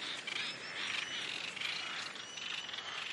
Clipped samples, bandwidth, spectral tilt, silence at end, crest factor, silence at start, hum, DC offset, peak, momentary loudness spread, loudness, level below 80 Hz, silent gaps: under 0.1%; 12 kHz; 0 dB/octave; 0 s; 18 dB; 0 s; none; under 0.1%; -24 dBFS; 4 LU; -39 LUFS; -86 dBFS; none